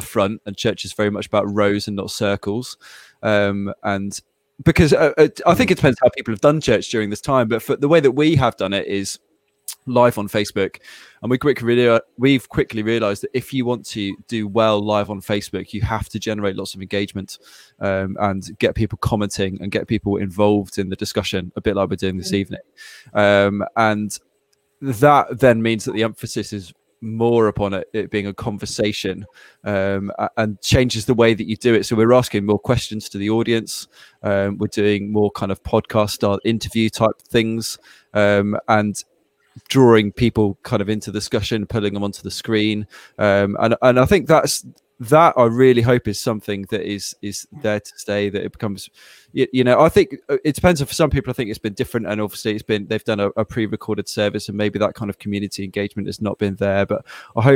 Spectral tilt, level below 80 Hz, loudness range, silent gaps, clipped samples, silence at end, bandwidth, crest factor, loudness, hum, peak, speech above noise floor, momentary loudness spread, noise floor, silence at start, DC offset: -5.5 dB/octave; -44 dBFS; 6 LU; none; under 0.1%; 0 s; 17 kHz; 18 dB; -19 LUFS; none; 0 dBFS; 47 dB; 12 LU; -65 dBFS; 0 s; under 0.1%